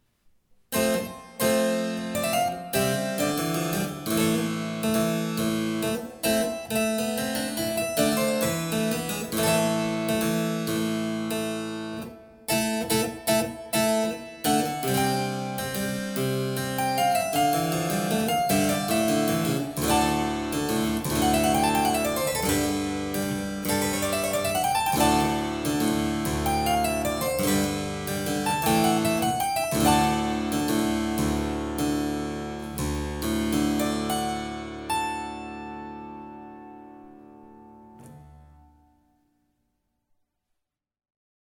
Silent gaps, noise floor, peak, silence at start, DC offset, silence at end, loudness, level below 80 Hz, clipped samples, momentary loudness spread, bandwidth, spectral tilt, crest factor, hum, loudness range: none; -80 dBFS; -8 dBFS; 0.7 s; under 0.1%; 3.15 s; -26 LUFS; -46 dBFS; under 0.1%; 8 LU; over 20 kHz; -4 dB/octave; 18 dB; none; 4 LU